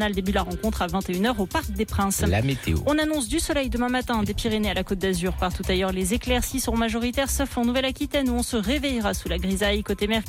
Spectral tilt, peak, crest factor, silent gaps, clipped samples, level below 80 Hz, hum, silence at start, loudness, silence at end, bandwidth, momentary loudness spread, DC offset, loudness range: -4.5 dB/octave; -12 dBFS; 12 dB; none; under 0.1%; -34 dBFS; none; 0 s; -24 LUFS; 0 s; 17 kHz; 3 LU; under 0.1%; 1 LU